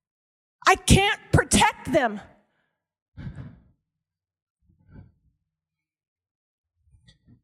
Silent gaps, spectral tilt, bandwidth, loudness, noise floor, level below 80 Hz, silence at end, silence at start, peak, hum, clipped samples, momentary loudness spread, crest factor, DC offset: 3.02-3.12 s; -4 dB/octave; 16 kHz; -21 LUFS; -88 dBFS; -40 dBFS; 3.95 s; 0.65 s; -4 dBFS; none; under 0.1%; 23 LU; 24 dB; under 0.1%